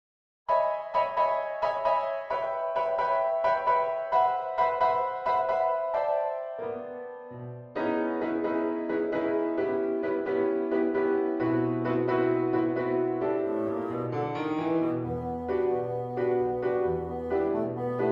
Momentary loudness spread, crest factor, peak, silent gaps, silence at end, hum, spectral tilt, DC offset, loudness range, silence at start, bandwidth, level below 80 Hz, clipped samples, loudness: 6 LU; 14 dB; -14 dBFS; none; 0 s; none; -8.5 dB/octave; under 0.1%; 4 LU; 0.5 s; 6 kHz; -60 dBFS; under 0.1%; -28 LUFS